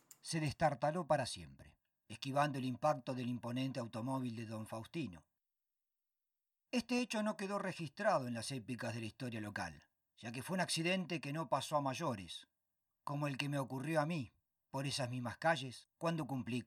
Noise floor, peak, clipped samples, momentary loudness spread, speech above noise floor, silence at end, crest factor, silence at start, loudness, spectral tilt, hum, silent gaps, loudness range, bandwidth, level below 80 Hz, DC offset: under -90 dBFS; -20 dBFS; under 0.1%; 11 LU; over 50 dB; 0 s; 20 dB; 0.25 s; -40 LUFS; -5 dB/octave; none; none; 4 LU; 16 kHz; -74 dBFS; under 0.1%